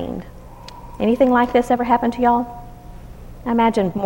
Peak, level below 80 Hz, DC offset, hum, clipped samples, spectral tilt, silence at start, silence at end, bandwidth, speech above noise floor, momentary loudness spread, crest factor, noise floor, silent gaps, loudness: -4 dBFS; -40 dBFS; under 0.1%; none; under 0.1%; -7 dB/octave; 0 s; 0 s; 16.5 kHz; 20 dB; 23 LU; 16 dB; -38 dBFS; none; -18 LUFS